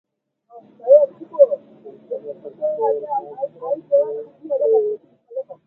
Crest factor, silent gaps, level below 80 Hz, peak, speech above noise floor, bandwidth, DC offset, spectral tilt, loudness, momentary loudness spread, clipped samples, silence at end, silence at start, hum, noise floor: 20 dB; none; -82 dBFS; -2 dBFS; 33 dB; 1.9 kHz; under 0.1%; -9 dB/octave; -19 LUFS; 18 LU; under 0.1%; 0.15 s; 0.55 s; none; -55 dBFS